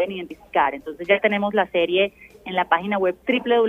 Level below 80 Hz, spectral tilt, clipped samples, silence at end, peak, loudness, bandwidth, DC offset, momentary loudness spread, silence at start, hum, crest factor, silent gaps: -58 dBFS; -6.5 dB/octave; under 0.1%; 0 s; -4 dBFS; -22 LUFS; 15 kHz; under 0.1%; 8 LU; 0 s; none; 18 dB; none